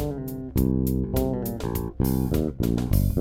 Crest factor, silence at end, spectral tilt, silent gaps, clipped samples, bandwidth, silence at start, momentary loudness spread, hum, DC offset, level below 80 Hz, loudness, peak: 16 dB; 0 s; -7.5 dB/octave; none; under 0.1%; 17 kHz; 0 s; 6 LU; none; under 0.1%; -32 dBFS; -26 LUFS; -8 dBFS